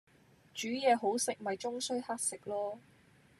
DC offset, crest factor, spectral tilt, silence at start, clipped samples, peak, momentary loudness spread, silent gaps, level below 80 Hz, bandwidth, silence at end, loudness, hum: under 0.1%; 20 dB; -2 dB/octave; 0.55 s; under 0.1%; -16 dBFS; 12 LU; none; -82 dBFS; 13.5 kHz; 0.6 s; -35 LUFS; none